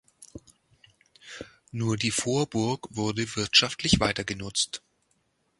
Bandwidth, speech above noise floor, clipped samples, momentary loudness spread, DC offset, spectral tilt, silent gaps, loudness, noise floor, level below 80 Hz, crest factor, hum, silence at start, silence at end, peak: 11.5 kHz; 45 dB; under 0.1%; 22 LU; under 0.1%; -3.5 dB/octave; none; -26 LUFS; -72 dBFS; -50 dBFS; 24 dB; none; 0.2 s; 0.8 s; -4 dBFS